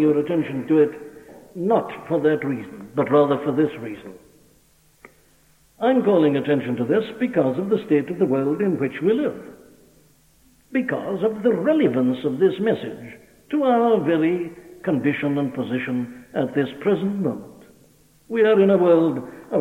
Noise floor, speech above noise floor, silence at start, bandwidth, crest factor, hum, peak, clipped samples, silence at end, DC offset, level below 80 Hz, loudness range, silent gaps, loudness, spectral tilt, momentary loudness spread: -57 dBFS; 37 dB; 0 s; 15.5 kHz; 16 dB; none; -6 dBFS; under 0.1%; 0 s; under 0.1%; -64 dBFS; 4 LU; none; -21 LUFS; -8 dB/octave; 12 LU